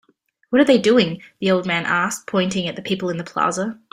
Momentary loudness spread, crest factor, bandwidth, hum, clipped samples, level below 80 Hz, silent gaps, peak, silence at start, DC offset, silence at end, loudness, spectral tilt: 10 LU; 16 dB; 15.5 kHz; none; under 0.1%; -60 dBFS; none; -2 dBFS; 0.5 s; under 0.1%; 0.2 s; -19 LUFS; -4.5 dB/octave